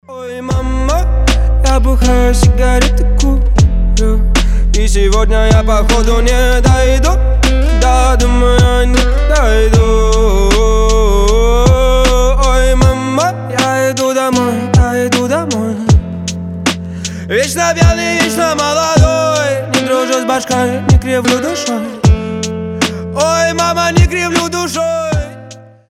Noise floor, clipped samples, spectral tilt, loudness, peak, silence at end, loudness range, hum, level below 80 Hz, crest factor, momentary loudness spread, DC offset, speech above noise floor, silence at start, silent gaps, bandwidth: -34 dBFS; under 0.1%; -5 dB/octave; -12 LUFS; 0 dBFS; 0.3 s; 3 LU; none; -12 dBFS; 10 dB; 6 LU; under 0.1%; 25 dB; 0.1 s; none; 14 kHz